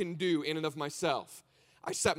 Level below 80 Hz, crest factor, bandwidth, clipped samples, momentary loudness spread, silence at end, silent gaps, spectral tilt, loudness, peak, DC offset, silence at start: -66 dBFS; 20 dB; 16 kHz; under 0.1%; 16 LU; 0 s; none; -3.5 dB/octave; -34 LUFS; -14 dBFS; under 0.1%; 0 s